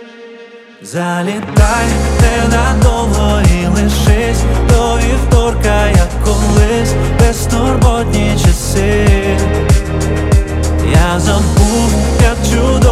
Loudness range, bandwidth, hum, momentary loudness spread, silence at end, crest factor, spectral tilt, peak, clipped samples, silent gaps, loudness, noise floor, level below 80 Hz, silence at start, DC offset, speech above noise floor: 1 LU; 15 kHz; none; 3 LU; 0 s; 10 dB; -5.5 dB/octave; 0 dBFS; under 0.1%; none; -12 LUFS; -35 dBFS; -14 dBFS; 0 s; under 0.1%; 24 dB